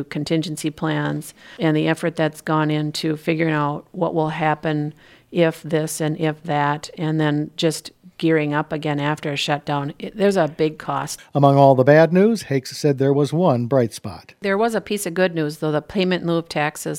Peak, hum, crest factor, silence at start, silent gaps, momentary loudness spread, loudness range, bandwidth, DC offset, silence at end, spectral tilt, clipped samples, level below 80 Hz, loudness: 0 dBFS; none; 20 dB; 0 s; none; 9 LU; 5 LU; 16.5 kHz; under 0.1%; 0 s; -6 dB/octave; under 0.1%; -58 dBFS; -20 LUFS